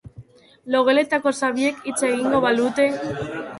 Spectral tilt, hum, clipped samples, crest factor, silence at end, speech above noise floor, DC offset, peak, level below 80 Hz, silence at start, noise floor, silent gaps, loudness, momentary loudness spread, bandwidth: -4 dB/octave; none; under 0.1%; 16 dB; 0 s; 25 dB; under 0.1%; -6 dBFS; -56 dBFS; 0.05 s; -46 dBFS; none; -21 LUFS; 7 LU; 11.5 kHz